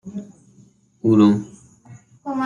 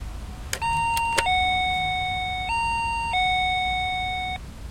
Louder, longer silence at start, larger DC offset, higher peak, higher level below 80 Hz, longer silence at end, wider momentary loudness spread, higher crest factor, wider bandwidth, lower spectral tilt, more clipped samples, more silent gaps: first, -18 LUFS vs -24 LUFS; about the same, 0.05 s vs 0 s; neither; about the same, -4 dBFS vs -4 dBFS; second, -62 dBFS vs -38 dBFS; about the same, 0 s vs 0 s; first, 21 LU vs 9 LU; about the same, 18 dB vs 22 dB; second, 7.6 kHz vs 16.5 kHz; first, -8 dB/octave vs -2.5 dB/octave; neither; neither